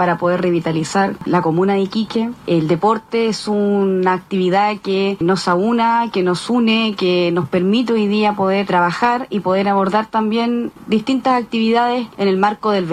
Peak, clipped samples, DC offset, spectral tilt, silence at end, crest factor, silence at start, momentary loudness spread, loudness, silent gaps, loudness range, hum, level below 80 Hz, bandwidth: -4 dBFS; under 0.1%; under 0.1%; -6 dB/octave; 0 s; 12 dB; 0 s; 3 LU; -17 LUFS; none; 1 LU; none; -56 dBFS; 11.5 kHz